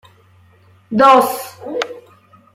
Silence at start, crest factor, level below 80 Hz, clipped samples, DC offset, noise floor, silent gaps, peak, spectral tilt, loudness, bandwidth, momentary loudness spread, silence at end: 0.9 s; 16 dB; -62 dBFS; under 0.1%; under 0.1%; -50 dBFS; none; 0 dBFS; -4 dB/octave; -15 LUFS; 16 kHz; 17 LU; 0.55 s